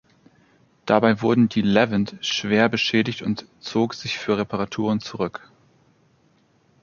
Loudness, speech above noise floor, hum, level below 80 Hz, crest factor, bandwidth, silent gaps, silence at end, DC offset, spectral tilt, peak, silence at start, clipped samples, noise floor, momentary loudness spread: -22 LUFS; 40 dB; none; -58 dBFS; 22 dB; 7.2 kHz; none; 1.45 s; under 0.1%; -5.5 dB/octave; -2 dBFS; 0.85 s; under 0.1%; -61 dBFS; 10 LU